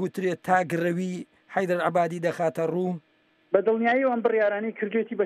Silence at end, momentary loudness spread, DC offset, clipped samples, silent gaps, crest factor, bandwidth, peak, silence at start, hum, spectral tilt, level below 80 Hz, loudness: 0 s; 8 LU; under 0.1%; under 0.1%; none; 20 dB; 14.5 kHz; -6 dBFS; 0 s; none; -7 dB/octave; -78 dBFS; -25 LUFS